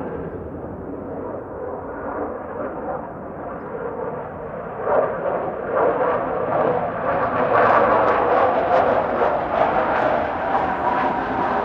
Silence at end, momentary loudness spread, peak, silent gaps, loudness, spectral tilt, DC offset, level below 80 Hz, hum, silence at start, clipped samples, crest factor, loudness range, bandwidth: 0 s; 14 LU; -2 dBFS; none; -21 LUFS; -8 dB/octave; under 0.1%; -46 dBFS; none; 0 s; under 0.1%; 18 dB; 11 LU; 6.8 kHz